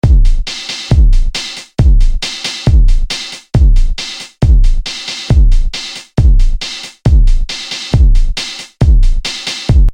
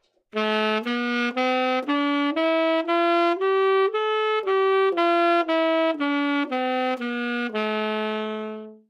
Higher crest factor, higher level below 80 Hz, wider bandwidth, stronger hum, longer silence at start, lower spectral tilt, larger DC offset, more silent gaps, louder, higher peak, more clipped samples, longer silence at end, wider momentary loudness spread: second, 8 dB vs 14 dB; first, -10 dBFS vs -84 dBFS; about the same, 10 kHz vs 10.5 kHz; neither; second, 0.05 s vs 0.35 s; about the same, -5 dB/octave vs -5 dB/octave; neither; neither; first, -14 LUFS vs -23 LUFS; first, 0 dBFS vs -8 dBFS; first, 0.2% vs under 0.1%; second, 0 s vs 0.15 s; first, 9 LU vs 6 LU